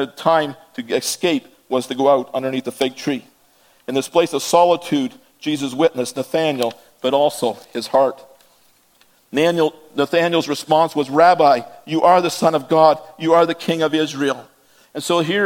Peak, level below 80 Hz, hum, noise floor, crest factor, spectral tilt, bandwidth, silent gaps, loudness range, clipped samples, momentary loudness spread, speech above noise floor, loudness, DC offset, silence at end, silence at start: 0 dBFS; -68 dBFS; none; -56 dBFS; 18 dB; -4.5 dB/octave; 17 kHz; none; 6 LU; under 0.1%; 10 LU; 39 dB; -18 LUFS; under 0.1%; 0 s; 0 s